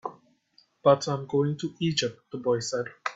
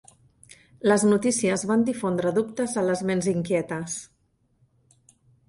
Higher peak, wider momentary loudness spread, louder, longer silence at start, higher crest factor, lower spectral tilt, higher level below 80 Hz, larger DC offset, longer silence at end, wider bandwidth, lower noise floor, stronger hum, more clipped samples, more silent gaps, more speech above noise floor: about the same, -6 dBFS vs -8 dBFS; about the same, 10 LU vs 9 LU; second, -27 LUFS vs -24 LUFS; second, 0.05 s vs 0.85 s; about the same, 22 dB vs 18 dB; about the same, -5 dB/octave vs -5 dB/octave; about the same, -66 dBFS vs -62 dBFS; neither; second, 0 s vs 1.45 s; second, 8 kHz vs 11.5 kHz; about the same, -64 dBFS vs -67 dBFS; neither; neither; neither; second, 38 dB vs 43 dB